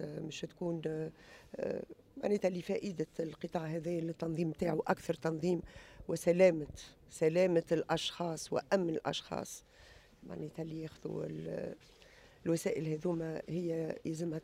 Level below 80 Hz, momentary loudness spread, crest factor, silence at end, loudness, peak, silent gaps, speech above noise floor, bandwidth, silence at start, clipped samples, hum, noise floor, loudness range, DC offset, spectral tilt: -66 dBFS; 15 LU; 22 dB; 0 s; -36 LUFS; -14 dBFS; none; 25 dB; 15.5 kHz; 0 s; under 0.1%; none; -60 dBFS; 8 LU; under 0.1%; -6 dB/octave